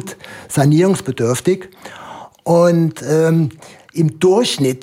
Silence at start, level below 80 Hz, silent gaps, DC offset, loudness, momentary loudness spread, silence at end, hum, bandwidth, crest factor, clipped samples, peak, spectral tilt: 0 s; -56 dBFS; none; under 0.1%; -15 LUFS; 21 LU; 0.05 s; none; 16 kHz; 14 dB; under 0.1%; -2 dBFS; -6 dB/octave